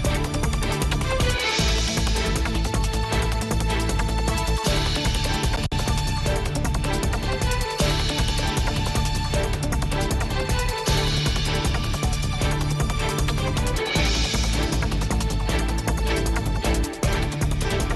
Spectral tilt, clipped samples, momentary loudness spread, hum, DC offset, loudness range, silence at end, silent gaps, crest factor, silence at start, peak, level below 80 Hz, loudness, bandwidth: -4.5 dB/octave; under 0.1%; 3 LU; none; under 0.1%; 1 LU; 0 s; none; 14 dB; 0 s; -8 dBFS; -26 dBFS; -24 LUFS; 12.5 kHz